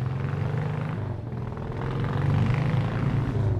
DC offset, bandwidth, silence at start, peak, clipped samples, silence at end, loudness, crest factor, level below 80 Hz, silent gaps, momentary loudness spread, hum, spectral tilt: under 0.1%; 7.8 kHz; 0 s; -14 dBFS; under 0.1%; 0 s; -28 LUFS; 12 dB; -42 dBFS; none; 9 LU; none; -9 dB/octave